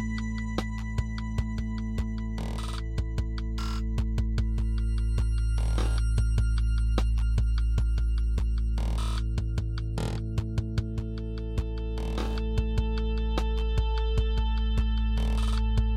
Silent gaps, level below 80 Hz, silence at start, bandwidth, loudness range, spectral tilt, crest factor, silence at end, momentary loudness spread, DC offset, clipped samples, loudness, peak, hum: none; -28 dBFS; 0 s; 10.5 kHz; 4 LU; -6.5 dB/octave; 16 dB; 0 s; 5 LU; under 0.1%; under 0.1%; -30 LUFS; -10 dBFS; none